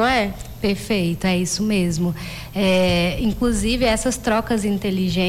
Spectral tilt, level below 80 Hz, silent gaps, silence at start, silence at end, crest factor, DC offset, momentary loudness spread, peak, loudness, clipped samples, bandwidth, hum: -5 dB/octave; -34 dBFS; none; 0 s; 0 s; 10 dB; under 0.1%; 6 LU; -10 dBFS; -20 LUFS; under 0.1%; 16 kHz; none